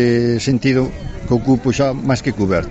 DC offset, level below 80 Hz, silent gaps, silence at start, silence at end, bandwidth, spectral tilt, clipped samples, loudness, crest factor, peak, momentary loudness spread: under 0.1%; -34 dBFS; none; 0 s; 0 s; 8.2 kHz; -6.5 dB/octave; under 0.1%; -17 LUFS; 12 dB; -4 dBFS; 4 LU